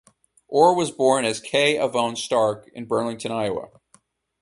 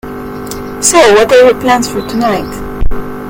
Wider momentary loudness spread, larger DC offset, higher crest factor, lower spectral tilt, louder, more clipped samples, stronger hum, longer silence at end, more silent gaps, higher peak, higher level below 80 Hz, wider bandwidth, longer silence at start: second, 9 LU vs 17 LU; neither; first, 20 dB vs 10 dB; about the same, -4 dB/octave vs -3 dB/octave; second, -22 LUFS vs -8 LUFS; second, under 0.1% vs 0.7%; neither; first, 0.75 s vs 0 s; neither; about the same, -2 dBFS vs 0 dBFS; second, -64 dBFS vs -22 dBFS; second, 11.5 kHz vs over 20 kHz; first, 0.5 s vs 0.05 s